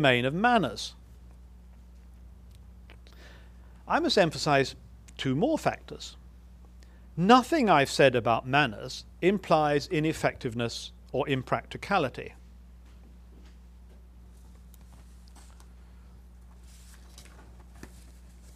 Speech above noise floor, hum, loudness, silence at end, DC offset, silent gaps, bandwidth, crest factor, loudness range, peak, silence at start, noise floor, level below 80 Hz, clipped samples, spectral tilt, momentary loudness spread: 24 dB; none; -26 LUFS; 0.05 s; under 0.1%; none; 15.5 kHz; 26 dB; 11 LU; -4 dBFS; 0 s; -50 dBFS; -50 dBFS; under 0.1%; -5 dB/octave; 20 LU